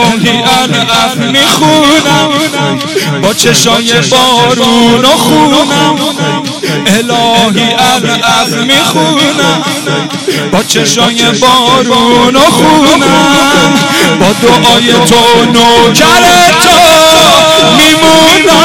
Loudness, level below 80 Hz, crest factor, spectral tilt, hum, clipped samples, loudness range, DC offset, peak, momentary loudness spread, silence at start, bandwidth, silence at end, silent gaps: -5 LUFS; -36 dBFS; 6 dB; -3 dB/octave; none; 2%; 5 LU; 0.8%; 0 dBFS; 8 LU; 0 s; 18.5 kHz; 0 s; none